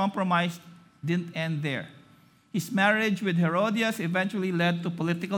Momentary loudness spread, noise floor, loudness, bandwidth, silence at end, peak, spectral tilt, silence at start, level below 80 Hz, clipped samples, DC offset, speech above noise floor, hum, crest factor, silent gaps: 10 LU; -58 dBFS; -27 LUFS; 18 kHz; 0 s; -10 dBFS; -6 dB/octave; 0 s; -74 dBFS; under 0.1%; under 0.1%; 31 dB; none; 18 dB; none